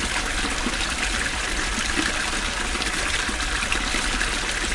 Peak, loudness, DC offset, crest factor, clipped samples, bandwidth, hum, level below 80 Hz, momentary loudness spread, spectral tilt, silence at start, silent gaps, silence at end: -6 dBFS; -23 LUFS; under 0.1%; 18 dB; under 0.1%; 11.5 kHz; none; -32 dBFS; 2 LU; -1.5 dB/octave; 0 s; none; 0 s